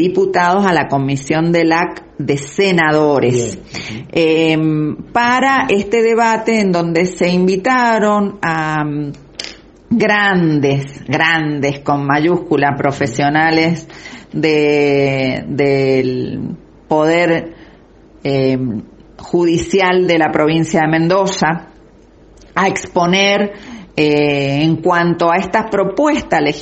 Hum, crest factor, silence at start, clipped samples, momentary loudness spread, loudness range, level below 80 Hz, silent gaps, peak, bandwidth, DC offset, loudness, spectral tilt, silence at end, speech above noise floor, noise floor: none; 14 dB; 0 s; under 0.1%; 11 LU; 3 LU; -46 dBFS; none; 0 dBFS; 8.6 kHz; under 0.1%; -14 LUFS; -5.5 dB/octave; 0 s; 30 dB; -43 dBFS